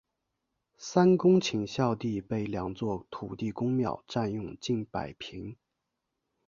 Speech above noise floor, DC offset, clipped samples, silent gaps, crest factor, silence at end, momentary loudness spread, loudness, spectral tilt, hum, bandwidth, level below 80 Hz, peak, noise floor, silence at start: 55 dB; under 0.1%; under 0.1%; none; 22 dB; 0.95 s; 17 LU; -30 LUFS; -6.5 dB/octave; none; 7.4 kHz; -60 dBFS; -10 dBFS; -84 dBFS; 0.8 s